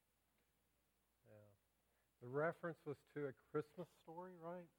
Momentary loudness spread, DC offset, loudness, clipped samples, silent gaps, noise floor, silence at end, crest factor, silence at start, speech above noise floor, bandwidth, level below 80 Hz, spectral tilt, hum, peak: 20 LU; under 0.1%; -50 LUFS; under 0.1%; none; -84 dBFS; 0.1 s; 22 dB; 1.25 s; 35 dB; 17.5 kHz; under -90 dBFS; -8 dB/octave; none; -30 dBFS